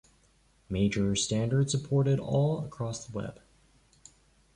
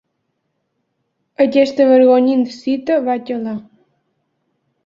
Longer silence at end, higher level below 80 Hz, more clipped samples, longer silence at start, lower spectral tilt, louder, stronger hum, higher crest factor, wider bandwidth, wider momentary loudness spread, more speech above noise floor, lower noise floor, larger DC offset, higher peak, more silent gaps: about the same, 1.2 s vs 1.25 s; first, -54 dBFS vs -66 dBFS; neither; second, 0.7 s vs 1.4 s; about the same, -5.5 dB/octave vs -6 dB/octave; second, -29 LUFS vs -15 LUFS; neither; about the same, 16 dB vs 16 dB; first, 11 kHz vs 7.4 kHz; second, 10 LU vs 13 LU; second, 37 dB vs 57 dB; second, -65 dBFS vs -71 dBFS; neither; second, -16 dBFS vs -2 dBFS; neither